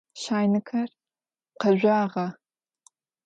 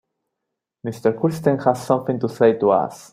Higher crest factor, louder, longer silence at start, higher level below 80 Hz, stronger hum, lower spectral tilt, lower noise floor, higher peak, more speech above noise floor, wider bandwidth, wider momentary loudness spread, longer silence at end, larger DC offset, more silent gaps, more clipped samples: about the same, 18 dB vs 18 dB; second, -25 LUFS vs -19 LUFS; second, 0.15 s vs 0.85 s; second, -76 dBFS vs -60 dBFS; neither; about the same, -6.5 dB/octave vs -7.5 dB/octave; first, under -90 dBFS vs -81 dBFS; second, -8 dBFS vs -2 dBFS; first, over 66 dB vs 62 dB; second, 9 kHz vs 15.5 kHz; first, 11 LU vs 7 LU; first, 0.95 s vs 0.1 s; neither; neither; neither